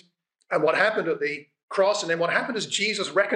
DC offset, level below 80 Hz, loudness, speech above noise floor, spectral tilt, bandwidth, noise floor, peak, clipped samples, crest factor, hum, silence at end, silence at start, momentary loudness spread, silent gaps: under 0.1%; -86 dBFS; -24 LUFS; 40 dB; -3 dB/octave; 10 kHz; -64 dBFS; -8 dBFS; under 0.1%; 18 dB; none; 0 s; 0.5 s; 8 LU; 1.63-1.68 s